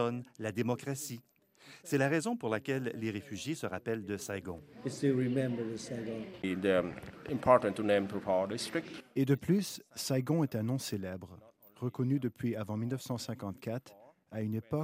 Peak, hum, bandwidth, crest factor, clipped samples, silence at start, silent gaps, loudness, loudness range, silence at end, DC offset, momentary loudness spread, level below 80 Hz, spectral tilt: -10 dBFS; none; 16 kHz; 24 dB; under 0.1%; 0 s; none; -34 LUFS; 5 LU; 0 s; under 0.1%; 11 LU; -70 dBFS; -6 dB/octave